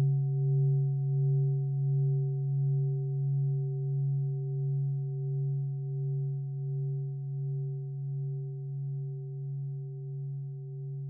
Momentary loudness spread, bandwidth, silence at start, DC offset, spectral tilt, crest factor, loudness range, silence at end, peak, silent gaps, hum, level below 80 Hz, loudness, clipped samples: 10 LU; 0.8 kHz; 0 s; under 0.1%; -16.5 dB/octave; 10 dB; 7 LU; 0 s; -22 dBFS; none; none; -80 dBFS; -32 LUFS; under 0.1%